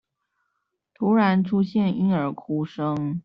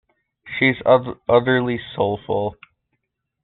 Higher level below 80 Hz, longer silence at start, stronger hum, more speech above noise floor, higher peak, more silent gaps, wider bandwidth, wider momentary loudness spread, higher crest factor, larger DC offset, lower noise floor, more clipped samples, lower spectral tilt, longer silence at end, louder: second, -64 dBFS vs -54 dBFS; first, 1 s vs 0.45 s; neither; about the same, 55 dB vs 56 dB; second, -8 dBFS vs -2 dBFS; neither; first, 5.6 kHz vs 4.3 kHz; about the same, 8 LU vs 9 LU; about the same, 16 dB vs 20 dB; neither; about the same, -77 dBFS vs -75 dBFS; neither; first, -7 dB/octave vs -4 dB/octave; second, 0.05 s vs 0.9 s; second, -23 LUFS vs -19 LUFS